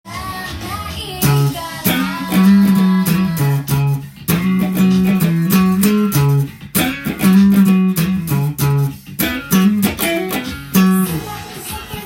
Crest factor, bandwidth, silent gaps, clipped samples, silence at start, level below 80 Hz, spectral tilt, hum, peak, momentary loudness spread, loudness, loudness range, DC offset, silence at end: 14 dB; 17 kHz; none; under 0.1%; 0.05 s; -40 dBFS; -6 dB/octave; none; 0 dBFS; 13 LU; -15 LUFS; 3 LU; under 0.1%; 0 s